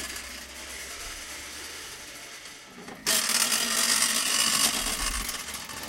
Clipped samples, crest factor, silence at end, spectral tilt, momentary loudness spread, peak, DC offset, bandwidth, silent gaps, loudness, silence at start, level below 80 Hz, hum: under 0.1%; 22 dB; 0 s; 0.5 dB/octave; 18 LU; -6 dBFS; under 0.1%; 17 kHz; none; -24 LUFS; 0 s; -48 dBFS; none